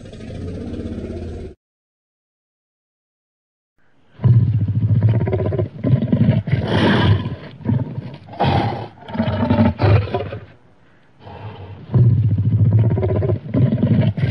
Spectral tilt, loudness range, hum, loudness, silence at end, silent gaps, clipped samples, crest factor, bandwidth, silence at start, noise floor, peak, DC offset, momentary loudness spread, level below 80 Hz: -9.5 dB/octave; 14 LU; none; -18 LUFS; 0 s; 1.57-3.76 s; under 0.1%; 16 dB; 5.8 kHz; 0 s; -53 dBFS; -2 dBFS; under 0.1%; 17 LU; -40 dBFS